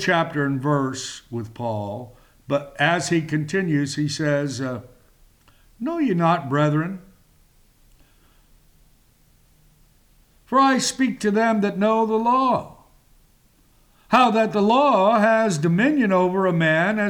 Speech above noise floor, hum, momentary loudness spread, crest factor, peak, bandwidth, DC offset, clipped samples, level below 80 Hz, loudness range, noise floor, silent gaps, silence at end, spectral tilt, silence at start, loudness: 37 dB; none; 12 LU; 16 dB; -6 dBFS; 18 kHz; under 0.1%; under 0.1%; -58 dBFS; 7 LU; -58 dBFS; none; 0 s; -5.5 dB/octave; 0 s; -20 LUFS